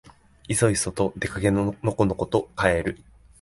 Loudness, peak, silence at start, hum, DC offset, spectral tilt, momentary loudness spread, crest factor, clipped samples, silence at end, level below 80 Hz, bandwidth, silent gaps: -24 LUFS; -4 dBFS; 0.5 s; none; under 0.1%; -5 dB/octave; 5 LU; 20 dB; under 0.1%; 0.45 s; -44 dBFS; 11.5 kHz; none